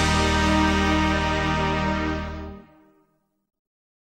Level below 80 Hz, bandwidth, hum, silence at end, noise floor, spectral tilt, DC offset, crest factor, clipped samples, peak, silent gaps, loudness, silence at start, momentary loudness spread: -32 dBFS; 13.5 kHz; none; 1.5 s; -68 dBFS; -5 dB/octave; under 0.1%; 16 dB; under 0.1%; -8 dBFS; none; -22 LUFS; 0 s; 13 LU